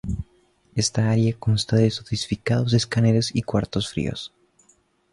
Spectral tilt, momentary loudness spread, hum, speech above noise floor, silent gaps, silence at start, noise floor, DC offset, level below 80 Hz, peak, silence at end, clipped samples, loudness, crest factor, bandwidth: -5.5 dB/octave; 12 LU; none; 40 dB; none; 0.05 s; -62 dBFS; under 0.1%; -44 dBFS; -6 dBFS; 0.85 s; under 0.1%; -23 LUFS; 16 dB; 11.5 kHz